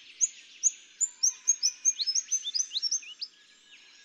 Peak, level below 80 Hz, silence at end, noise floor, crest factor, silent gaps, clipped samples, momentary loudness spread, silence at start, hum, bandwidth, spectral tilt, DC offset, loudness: -12 dBFS; under -90 dBFS; 0.3 s; -57 dBFS; 20 dB; none; under 0.1%; 7 LU; 0.1 s; none; over 20 kHz; 7 dB/octave; under 0.1%; -27 LUFS